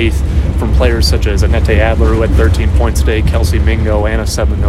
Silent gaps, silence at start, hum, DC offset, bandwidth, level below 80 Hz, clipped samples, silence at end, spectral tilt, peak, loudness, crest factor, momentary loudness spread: none; 0 s; none; under 0.1%; 13.5 kHz; -12 dBFS; under 0.1%; 0 s; -6 dB/octave; 0 dBFS; -12 LUFS; 10 dB; 4 LU